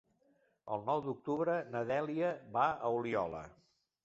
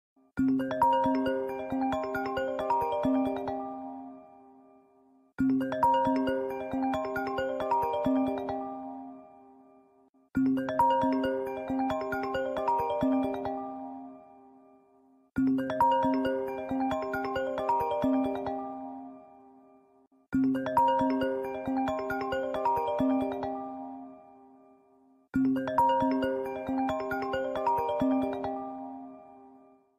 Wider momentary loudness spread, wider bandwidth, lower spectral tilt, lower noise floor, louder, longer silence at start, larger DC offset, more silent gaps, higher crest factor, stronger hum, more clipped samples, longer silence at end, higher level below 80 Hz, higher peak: second, 9 LU vs 15 LU; second, 7.8 kHz vs 14 kHz; second, -5.5 dB/octave vs -7 dB/octave; first, -74 dBFS vs -64 dBFS; second, -36 LUFS vs -30 LUFS; first, 0.65 s vs 0.35 s; neither; second, none vs 10.09-10.13 s; about the same, 18 dB vs 16 dB; neither; neither; first, 0.55 s vs 0.4 s; second, -70 dBFS vs -60 dBFS; second, -18 dBFS vs -14 dBFS